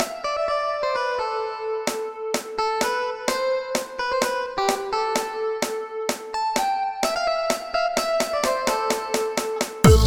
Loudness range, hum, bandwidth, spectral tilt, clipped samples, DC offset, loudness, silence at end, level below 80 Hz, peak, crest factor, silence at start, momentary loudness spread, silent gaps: 2 LU; none; over 20 kHz; -4 dB/octave; under 0.1%; under 0.1%; -24 LUFS; 0 s; -36 dBFS; 0 dBFS; 22 dB; 0 s; 5 LU; none